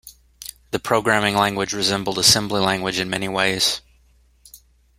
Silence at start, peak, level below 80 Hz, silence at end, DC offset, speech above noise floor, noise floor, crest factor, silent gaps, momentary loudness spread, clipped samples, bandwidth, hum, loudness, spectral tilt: 0.05 s; 0 dBFS; -50 dBFS; 0.45 s; under 0.1%; 36 dB; -56 dBFS; 22 dB; none; 14 LU; under 0.1%; 16.5 kHz; none; -19 LUFS; -2.5 dB/octave